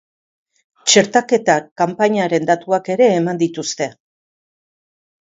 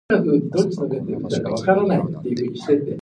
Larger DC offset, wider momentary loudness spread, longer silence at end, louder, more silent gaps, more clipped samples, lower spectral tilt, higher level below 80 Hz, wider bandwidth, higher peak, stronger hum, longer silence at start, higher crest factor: neither; about the same, 9 LU vs 7 LU; first, 1.3 s vs 0 s; first, -16 LUFS vs -21 LUFS; first, 1.71-1.76 s vs none; neither; second, -3.5 dB/octave vs -7 dB/octave; second, -66 dBFS vs -56 dBFS; second, 7.8 kHz vs 10 kHz; first, 0 dBFS vs -4 dBFS; neither; first, 0.85 s vs 0.1 s; about the same, 18 dB vs 16 dB